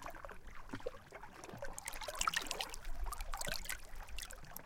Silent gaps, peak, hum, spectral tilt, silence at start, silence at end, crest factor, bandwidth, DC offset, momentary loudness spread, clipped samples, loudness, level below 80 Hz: none; -16 dBFS; none; -1.5 dB/octave; 0 s; 0 s; 28 dB; 17 kHz; under 0.1%; 16 LU; under 0.1%; -44 LUFS; -48 dBFS